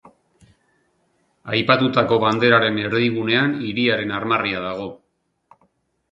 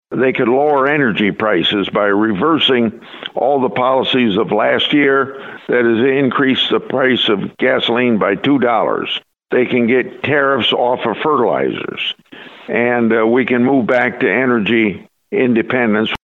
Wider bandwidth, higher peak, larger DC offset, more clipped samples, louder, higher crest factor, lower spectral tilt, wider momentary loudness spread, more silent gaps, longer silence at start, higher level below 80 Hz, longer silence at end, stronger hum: about the same, 7.6 kHz vs 7 kHz; about the same, 0 dBFS vs 0 dBFS; neither; neither; second, -19 LUFS vs -14 LUFS; first, 22 dB vs 14 dB; about the same, -7 dB/octave vs -7 dB/octave; first, 11 LU vs 7 LU; neither; about the same, 0.05 s vs 0.1 s; about the same, -58 dBFS vs -60 dBFS; first, 1.15 s vs 0.05 s; neither